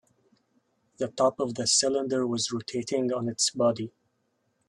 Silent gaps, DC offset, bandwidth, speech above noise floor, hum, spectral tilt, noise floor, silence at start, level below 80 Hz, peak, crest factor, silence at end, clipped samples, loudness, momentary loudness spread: none; under 0.1%; 12 kHz; 47 dB; none; -3 dB/octave; -74 dBFS; 1 s; -70 dBFS; -10 dBFS; 18 dB; 0.8 s; under 0.1%; -27 LUFS; 12 LU